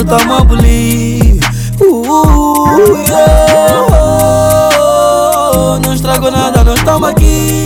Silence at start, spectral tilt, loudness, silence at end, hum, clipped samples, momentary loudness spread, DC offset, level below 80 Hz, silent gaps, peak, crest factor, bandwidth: 0 s; -5.5 dB/octave; -8 LUFS; 0 s; none; 4%; 4 LU; under 0.1%; -14 dBFS; none; 0 dBFS; 8 dB; 18.5 kHz